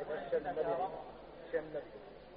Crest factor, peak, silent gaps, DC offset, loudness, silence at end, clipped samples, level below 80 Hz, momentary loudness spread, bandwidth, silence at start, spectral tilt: 16 dB; -24 dBFS; none; under 0.1%; -39 LUFS; 0 s; under 0.1%; -66 dBFS; 16 LU; 5 kHz; 0 s; -4 dB/octave